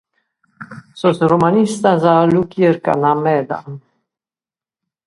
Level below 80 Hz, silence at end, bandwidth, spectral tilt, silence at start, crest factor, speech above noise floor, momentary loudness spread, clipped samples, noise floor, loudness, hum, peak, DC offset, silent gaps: -54 dBFS; 1.3 s; 11.5 kHz; -7 dB/octave; 0.6 s; 16 dB; over 76 dB; 22 LU; under 0.1%; under -90 dBFS; -15 LUFS; none; 0 dBFS; under 0.1%; none